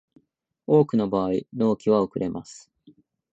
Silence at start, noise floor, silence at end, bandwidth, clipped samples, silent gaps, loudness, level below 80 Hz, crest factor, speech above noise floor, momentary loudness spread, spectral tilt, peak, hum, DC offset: 0.7 s; -65 dBFS; 0.75 s; 8.2 kHz; under 0.1%; none; -23 LUFS; -60 dBFS; 18 dB; 43 dB; 16 LU; -8 dB/octave; -6 dBFS; none; under 0.1%